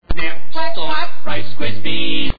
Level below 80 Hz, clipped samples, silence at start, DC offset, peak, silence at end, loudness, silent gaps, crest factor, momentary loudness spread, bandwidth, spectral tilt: -32 dBFS; under 0.1%; 0 s; 50%; -2 dBFS; 0 s; -23 LUFS; none; 12 dB; 6 LU; 5 kHz; -6.5 dB/octave